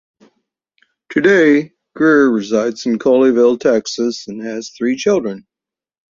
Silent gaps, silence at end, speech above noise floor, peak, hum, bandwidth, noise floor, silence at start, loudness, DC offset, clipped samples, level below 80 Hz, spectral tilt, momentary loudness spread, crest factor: none; 0.7 s; 74 dB; -2 dBFS; none; 7.6 kHz; -88 dBFS; 1.1 s; -15 LUFS; under 0.1%; under 0.1%; -60 dBFS; -5 dB/octave; 14 LU; 14 dB